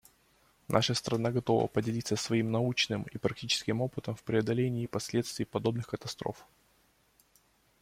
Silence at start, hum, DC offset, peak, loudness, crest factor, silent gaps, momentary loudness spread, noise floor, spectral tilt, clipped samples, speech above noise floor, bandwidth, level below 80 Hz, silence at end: 0.7 s; none; under 0.1%; -8 dBFS; -32 LUFS; 24 dB; none; 8 LU; -69 dBFS; -5 dB/octave; under 0.1%; 37 dB; 16 kHz; -64 dBFS; 1.4 s